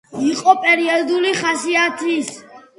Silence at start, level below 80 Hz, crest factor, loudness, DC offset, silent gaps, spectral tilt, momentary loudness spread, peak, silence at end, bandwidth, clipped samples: 0.1 s; -68 dBFS; 18 dB; -16 LUFS; under 0.1%; none; -2.5 dB/octave; 7 LU; 0 dBFS; 0.2 s; 11.5 kHz; under 0.1%